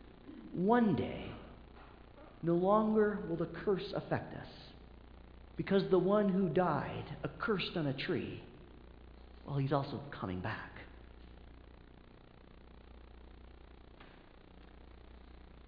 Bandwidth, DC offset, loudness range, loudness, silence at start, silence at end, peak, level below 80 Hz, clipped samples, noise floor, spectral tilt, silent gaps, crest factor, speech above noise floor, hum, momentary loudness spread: 5.2 kHz; under 0.1%; 9 LU; -35 LUFS; 0 s; 0.05 s; -16 dBFS; -58 dBFS; under 0.1%; -58 dBFS; -6 dB/octave; none; 20 dB; 24 dB; none; 27 LU